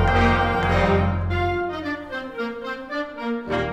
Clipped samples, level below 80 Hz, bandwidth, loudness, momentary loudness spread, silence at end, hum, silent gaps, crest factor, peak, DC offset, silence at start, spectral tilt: under 0.1%; -32 dBFS; 8.4 kHz; -23 LUFS; 11 LU; 0 s; none; none; 18 dB; -4 dBFS; under 0.1%; 0 s; -7 dB/octave